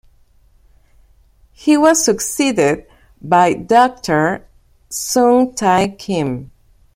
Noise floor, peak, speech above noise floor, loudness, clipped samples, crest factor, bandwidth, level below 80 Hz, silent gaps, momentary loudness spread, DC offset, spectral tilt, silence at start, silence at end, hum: -51 dBFS; 0 dBFS; 37 dB; -15 LUFS; under 0.1%; 16 dB; 16.5 kHz; -48 dBFS; none; 12 LU; under 0.1%; -4 dB/octave; 1.65 s; 0.5 s; none